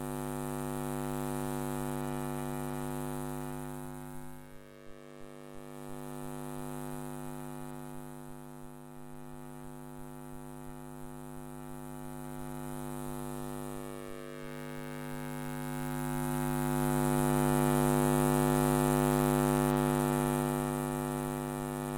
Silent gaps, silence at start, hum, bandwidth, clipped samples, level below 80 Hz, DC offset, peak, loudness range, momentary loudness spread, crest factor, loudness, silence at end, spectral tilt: none; 0 s; none; 17 kHz; under 0.1%; -50 dBFS; under 0.1%; -12 dBFS; 17 LU; 20 LU; 22 dB; -34 LUFS; 0 s; -6 dB/octave